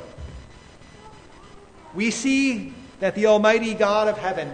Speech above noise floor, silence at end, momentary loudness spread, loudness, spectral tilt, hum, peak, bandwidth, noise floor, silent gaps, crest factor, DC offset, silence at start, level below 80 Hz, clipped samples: 25 dB; 0 s; 21 LU; -21 LUFS; -4.5 dB/octave; none; -4 dBFS; 9.6 kHz; -46 dBFS; none; 20 dB; under 0.1%; 0 s; -50 dBFS; under 0.1%